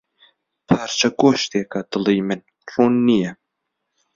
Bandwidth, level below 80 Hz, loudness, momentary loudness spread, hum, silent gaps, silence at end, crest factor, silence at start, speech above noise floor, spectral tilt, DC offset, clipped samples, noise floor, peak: 7.6 kHz; -58 dBFS; -19 LUFS; 11 LU; none; none; 0.8 s; 18 dB; 0.7 s; 59 dB; -5 dB/octave; under 0.1%; under 0.1%; -77 dBFS; -2 dBFS